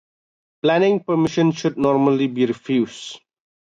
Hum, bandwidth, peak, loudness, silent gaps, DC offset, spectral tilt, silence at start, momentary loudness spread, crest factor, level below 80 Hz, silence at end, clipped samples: none; 9 kHz; -6 dBFS; -19 LUFS; none; under 0.1%; -6.5 dB/octave; 0.65 s; 7 LU; 14 dB; -62 dBFS; 0.45 s; under 0.1%